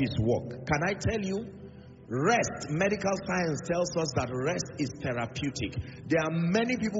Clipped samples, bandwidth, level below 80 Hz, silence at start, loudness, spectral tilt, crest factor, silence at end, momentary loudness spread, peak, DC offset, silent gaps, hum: under 0.1%; 8 kHz; -52 dBFS; 0 s; -30 LUFS; -5 dB/octave; 16 dB; 0 s; 9 LU; -14 dBFS; under 0.1%; none; none